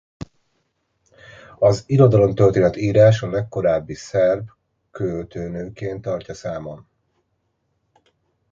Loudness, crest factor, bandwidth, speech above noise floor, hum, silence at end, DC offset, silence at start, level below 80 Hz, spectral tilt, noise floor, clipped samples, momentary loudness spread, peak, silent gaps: -19 LUFS; 18 dB; 7.6 kHz; 52 dB; none; 1.75 s; under 0.1%; 1.6 s; -48 dBFS; -7.5 dB/octave; -71 dBFS; under 0.1%; 17 LU; -2 dBFS; none